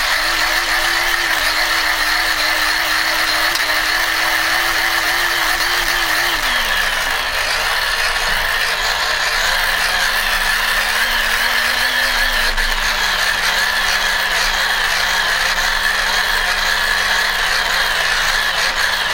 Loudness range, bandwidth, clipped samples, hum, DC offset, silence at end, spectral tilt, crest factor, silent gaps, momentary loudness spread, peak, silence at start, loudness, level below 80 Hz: 1 LU; 16 kHz; under 0.1%; none; under 0.1%; 0 s; 0 dB/octave; 16 dB; none; 1 LU; 0 dBFS; 0 s; -15 LUFS; -32 dBFS